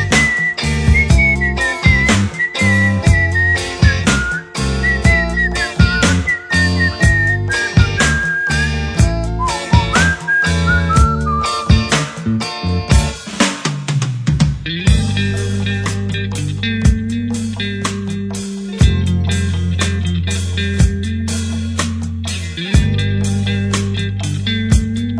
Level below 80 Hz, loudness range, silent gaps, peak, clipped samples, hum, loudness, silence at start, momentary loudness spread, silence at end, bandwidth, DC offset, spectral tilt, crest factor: -22 dBFS; 5 LU; none; 0 dBFS; under 0.1%; none; -15 LUFS; 0 s; 8 LU; 0 s; 11 kHz; under 0.1%; -5 dB/octave; 14 dB